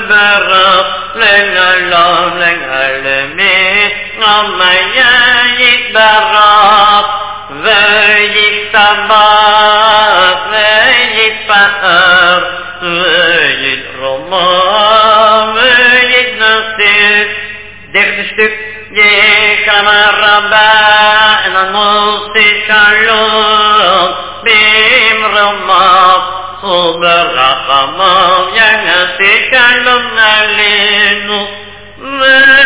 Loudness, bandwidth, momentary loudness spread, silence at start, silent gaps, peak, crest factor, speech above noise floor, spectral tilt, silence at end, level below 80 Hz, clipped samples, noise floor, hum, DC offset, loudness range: -6 LUFS; 4 kHz; 8 LU; 0 s; none; 0 dBFS; 8 dB; 21 dB; -5.5 dB/octave; 0 s; -42 dBFS; 3%; -28 dBFS; none; 1%; 2 LU